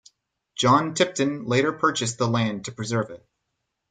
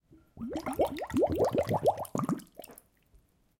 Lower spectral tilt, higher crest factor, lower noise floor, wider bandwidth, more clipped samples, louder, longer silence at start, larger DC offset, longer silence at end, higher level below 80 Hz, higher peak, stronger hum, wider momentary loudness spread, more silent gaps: second, -4.5 dB/octave vs -6.5 dB/octave; about the same, 20 dB vs 18 dB; first, -79 dBFS vs -65 dBFS; second, 9.6 kHz vs 17 kHz; neither; first, -23 LUFS vs -31 LUFS; first, 0.55 s vs 0.35 s; neither; about the same, 0.75 s vs 0.85 s; second, -64 dBFS vs -58 dBFS; first, -6 dBFS vs -14 dBFS; neither; second, 9 LU vs 19 LU; neither